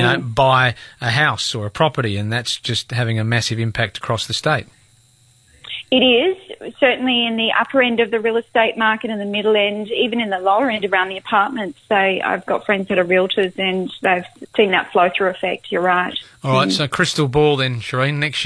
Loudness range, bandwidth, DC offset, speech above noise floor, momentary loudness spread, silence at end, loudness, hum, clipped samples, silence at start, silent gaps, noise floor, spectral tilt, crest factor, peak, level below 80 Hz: 3 LU; 11 kHz; under 0.1%; 35 dB; 6 LU; 0 s; -18 LUFS; none; under 0.1%; 0 s; none; -53 dBFS; -5 dB/octave; 16 dB; -2 dBFS; -50 dBFS